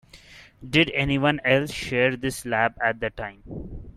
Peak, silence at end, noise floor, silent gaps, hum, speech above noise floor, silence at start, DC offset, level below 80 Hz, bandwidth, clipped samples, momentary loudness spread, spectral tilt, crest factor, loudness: -6 dBFS; 0.05 s; -49 dBFS; none; none; 25 dB; 0.15 s; under 0.1%; -46 dBFS; 15 kHz; under 0.1%; 17 LU; -5 dB/octave; 20 dB; -23 LUFS